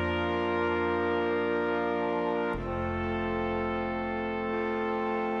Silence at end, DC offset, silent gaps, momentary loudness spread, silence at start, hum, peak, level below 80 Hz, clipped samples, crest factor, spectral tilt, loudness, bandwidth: 0 s; under 0.1%; none; 4 LU; 0 s; none; -18 dBFS; -48 dBFS; under 0.1%; 12 dB; -8 dB/octave; -30 LUFS; 7 kHz